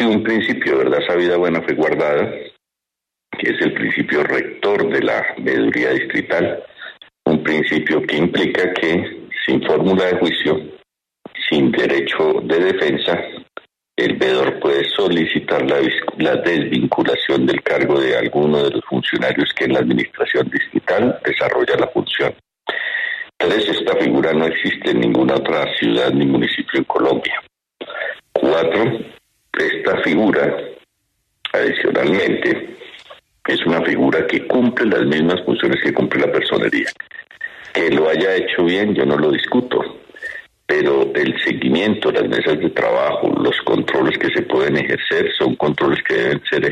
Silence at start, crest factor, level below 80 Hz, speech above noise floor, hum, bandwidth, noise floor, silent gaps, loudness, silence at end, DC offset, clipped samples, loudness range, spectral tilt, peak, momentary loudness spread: 0 s; 16 dB; -54 dBFS; 67 dB; none; 9.4 kHz; -83 dBFS; none; -17 LUFS; 0 s; under 0.1%; under 0.1%; 2 LU; -6.5 dB/octave; -2 dBFS; 8 LU